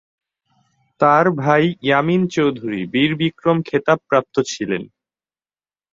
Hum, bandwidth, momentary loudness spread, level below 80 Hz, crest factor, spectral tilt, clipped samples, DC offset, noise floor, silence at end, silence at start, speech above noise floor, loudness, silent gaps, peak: none; 7.8 kHz; 7 LU; -58 dBFS; 18 dB; -6 dB/octave; under 0.1%; under 0.1%; under -90 dBFS; 1.1 s; 1 s; over 73 dB; -18 LUFS; none; -2 dBFS